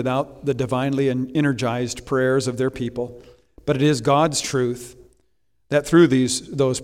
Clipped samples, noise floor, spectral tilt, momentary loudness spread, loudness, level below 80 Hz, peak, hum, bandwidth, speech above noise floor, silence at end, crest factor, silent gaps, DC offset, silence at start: under 0.1%; -69 dBFS; -5.5 dB/octave; 11 LU; -21 LUFS; -50 dBFS; -4 dBFS; none; 15.5 kHz; 49 dB; 0 s; 18 dB; none; under 0.1%; 0 s